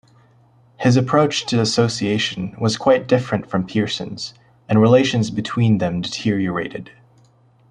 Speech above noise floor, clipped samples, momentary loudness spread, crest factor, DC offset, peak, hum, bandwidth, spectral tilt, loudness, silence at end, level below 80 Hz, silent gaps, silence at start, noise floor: 36 dB; under 0.1%; 10 LU; 18 dB; under 0.1%; -2 dBFS; none; 10.5 kHz; -5.5 dB/octave; -19 LUFS; 0.85 s; -54 dBFS; none; 0.8 s; -54 dBFS